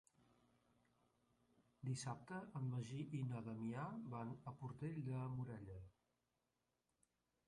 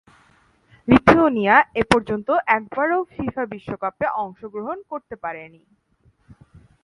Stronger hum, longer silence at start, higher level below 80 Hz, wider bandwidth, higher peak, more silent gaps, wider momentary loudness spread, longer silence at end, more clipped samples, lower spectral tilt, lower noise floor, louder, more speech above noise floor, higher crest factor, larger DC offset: first, 60 Hz at -70 dBFS vs none; first, 1.8 s vs 0.85 s; second, -76 dBFS vs -46 dBFS; about the same, 11 kHz vs 11.5 kHz; second, -34 dBFS vs 0 dBFS; neither; second, 7 LU vs 17 LU; first, 1.55 s vs 0.25 s; neither; about the same, -6.5 dB/octave vs -6.5 dB/octave; first, -89 dBFS vs -59 dBFS; second, -49 LUFS vs -20 LUFS; about the same, 41 dB vs 39 dB; second, 16 dB vs 22 dB; neither